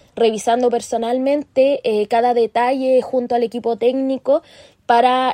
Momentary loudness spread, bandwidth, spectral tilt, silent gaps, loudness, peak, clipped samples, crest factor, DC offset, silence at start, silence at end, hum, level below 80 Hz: 5 LU; 12 kHz; -4 dB/octave; none; -17 LUFS; -2 dBFS; under 0.1%; 16 dB; under 0.1%; 0.15 s; 0 s; none; -62 dBFS